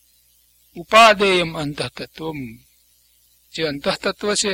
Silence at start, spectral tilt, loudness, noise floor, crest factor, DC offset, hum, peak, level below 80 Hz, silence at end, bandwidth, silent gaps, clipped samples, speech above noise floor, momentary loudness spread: 0.75 s; -3 dB/octave; -18 LUFS; -58 dBFS; 20 dB; under 0.1%; 60 Hz at -50 dBFS; 0 dBFS; -52 dBFS; 0 s; 17 kHz; none; under 0.1%; 39 dB; 22 LU